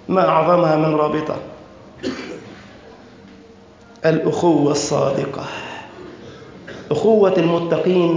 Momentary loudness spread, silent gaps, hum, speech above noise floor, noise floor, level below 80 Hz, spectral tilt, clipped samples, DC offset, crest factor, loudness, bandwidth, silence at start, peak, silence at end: 23 LU; none; none; 28 dB; -44 dBFS; -54 dBFS; -6 dB/octave; under 0.1%; under 0.1%; 16 dB; -18 LUFS; 7.6 kHz; 0.1 s; -2 dBFS; 0 s